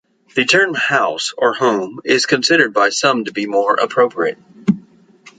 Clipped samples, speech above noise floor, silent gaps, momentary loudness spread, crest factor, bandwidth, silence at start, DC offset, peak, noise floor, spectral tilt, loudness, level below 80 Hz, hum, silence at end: under 0.1%; 31 dB; none; 8 LU; 16 dB; 9.4 kHz; 0.35 s; under 0.1%; -2 dBFS; -46 dBFS; -3.5 dB/octave; -15 LUFS; -64 dBFS; none; 0.1 s